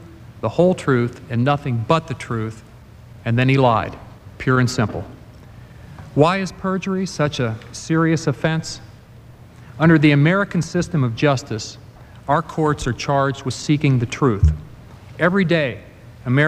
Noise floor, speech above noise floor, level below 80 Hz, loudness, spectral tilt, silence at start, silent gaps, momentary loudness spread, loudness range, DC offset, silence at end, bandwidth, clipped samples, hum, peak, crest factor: -42 dBFS; 24 dB; -36 dBFS; -19 LUFS; -6.5 dB/octave; 0 s; none; 15 LU; 3 LU; under 0.1%; 0 s; 12 kHz; under 0.1%; none; 0 dBFS; 20 dB